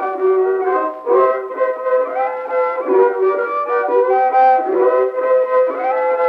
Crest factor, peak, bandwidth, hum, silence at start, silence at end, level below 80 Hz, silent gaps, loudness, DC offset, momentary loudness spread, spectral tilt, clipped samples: 12 dB; -2 dBFS; 5 kHz; none; 0 s; 0 s; -72 dBFS; none; -16 LUFS; under 0.1%; 6 LU; -6.5 dB/octave; under 0.1%